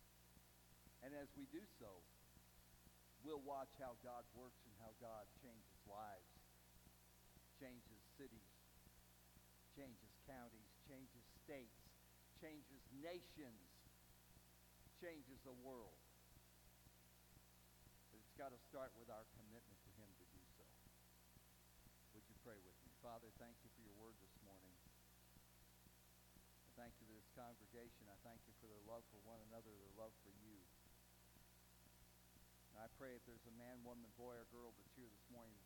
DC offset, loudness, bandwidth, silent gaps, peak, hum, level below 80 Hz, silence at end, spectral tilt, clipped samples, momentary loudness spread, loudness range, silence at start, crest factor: under 0.1%; -63 LUFS; 18 kHz; none; -40 dBFS; 60 Hz at -75 dBFS; -76 dBFS; 0 s; -4.5 dB/octave; under 0.1%; 12 LU; 8 LU; 0 s; 22 dB